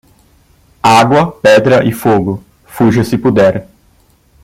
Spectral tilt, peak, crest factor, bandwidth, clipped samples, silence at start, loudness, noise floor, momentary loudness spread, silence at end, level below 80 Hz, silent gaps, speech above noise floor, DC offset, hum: -6 dB/octave; 0 dBFS; 12 dB; 16.5 kHz; under 0.1%; 0.85 s; -10 LUFS; -50 dBFS; 8 LU; 0.8 s; -44 dBFS; none; 40 dB; under 0.1%; none